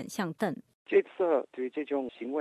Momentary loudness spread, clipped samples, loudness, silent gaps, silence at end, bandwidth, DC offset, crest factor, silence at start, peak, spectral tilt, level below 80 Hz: 8 LU; under 0.1%; -31 LUFS; 0.74-0.86 s; 0 s; 14.5 kHz; under 0.1%; 18 dB; 0 s; -12 dBFS; -6 dB/octave; -78 dBFS